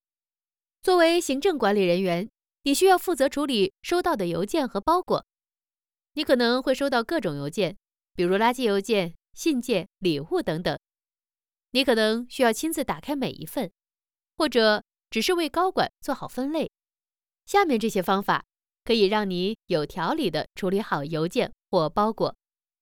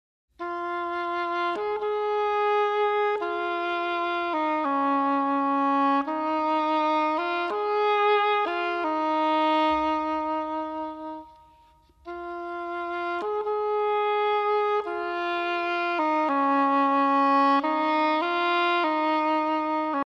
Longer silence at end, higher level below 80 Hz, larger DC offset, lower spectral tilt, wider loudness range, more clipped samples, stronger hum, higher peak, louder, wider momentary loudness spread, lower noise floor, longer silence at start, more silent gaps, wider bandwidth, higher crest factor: first, 0.5 s vs 0 s; first, -56 dBFS vs -64 dBFS; neither; about the same, -4.5 dB/octave vs -4.5 dB/octave; second, 3 LU vs 6 LU; neither; neither; first, -6 dBFS vs -12 dBFS; about the same, -25 LUFS vs -25 LUFS; about the same, 9 LU vs 9 LU; first, under -90 dBFS vs -58 dBFS; first, 0.85 s vs 0.4 s; neither; first, 19 kHz vs 7.6 kHz; first, 18 dB vs 12 dB